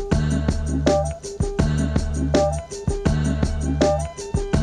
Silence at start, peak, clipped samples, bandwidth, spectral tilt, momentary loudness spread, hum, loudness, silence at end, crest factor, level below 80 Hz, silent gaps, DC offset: 0 s; -6 dBFS; under 0.1%; 11 kHz; -6.5 dB/octave; 7 LU; none; -22 LUFS; 0 s; 16 dB; -26 dBFS; none; under 0.1%